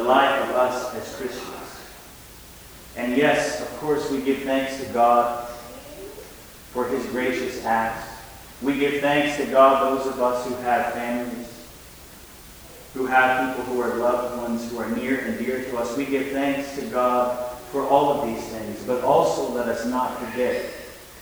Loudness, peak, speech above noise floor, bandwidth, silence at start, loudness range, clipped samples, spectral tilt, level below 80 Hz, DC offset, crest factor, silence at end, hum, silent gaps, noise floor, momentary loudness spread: -23 LUFS; -2 dBFS; 21 dB; over 20 kHz; 0 s; 5 LU; under 0.1%; -4.5 dB/octave; -52 dBFS; under 0.1%; 22 dB; 0 s; none; none; -44 dBFS; 22 LU